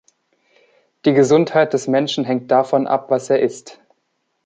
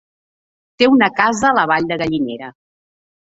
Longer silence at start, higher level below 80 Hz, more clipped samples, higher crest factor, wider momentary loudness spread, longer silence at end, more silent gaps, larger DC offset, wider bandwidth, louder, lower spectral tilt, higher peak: first, 1.05 s vs 0.8 s; second, -66 dBFS vs -54 dBFS; neither; about the same, 16 dB vs 16 dB; second, 7 LU vs 13 LU; about the same, 0.7 s vs 0.75 s; neither; neither; first, 9.4 kHz vs 8 kHz; about the same, -17 LUFS vs -15 LUFS; about the same, -5.5 dB/octave vs -4.5 dB/octave; about the same, -2 dBFS vs 0 dBFS